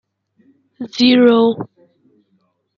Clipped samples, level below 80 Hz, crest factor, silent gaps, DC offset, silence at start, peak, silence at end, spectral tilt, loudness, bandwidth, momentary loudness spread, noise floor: under 0.1%; -64 dBFS; 16 dB; none; under 0.1%; 0.8 s; -2 dBFS; 1.1 s; -5.5 dB/octave; -12 LUFS; 7.2 kHz; 22 LU; -63 dBFS